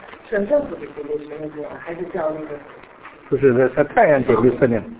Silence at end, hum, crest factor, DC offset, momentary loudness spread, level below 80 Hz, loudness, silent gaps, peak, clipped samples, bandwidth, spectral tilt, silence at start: 0 s; none; 18 dB; under 0.1%; 16 LU; -50 dBFS; -19 LUFS; none; -2 dBFS; under 0.1%; 4 kHz; -11.5 dB/octave; 0 s